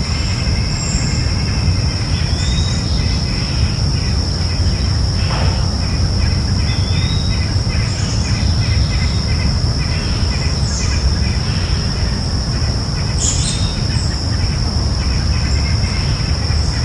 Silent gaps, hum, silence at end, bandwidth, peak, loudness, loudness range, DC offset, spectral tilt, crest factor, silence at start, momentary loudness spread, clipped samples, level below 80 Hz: none; none; 0 s; 11.5 kHz; -2 dBFS; -17 LUFS; 1 LU; under 0.1%; -4.5 dB/octave; 14 dB; 0 s; 2 LU; under 0.1%; -20 dBFS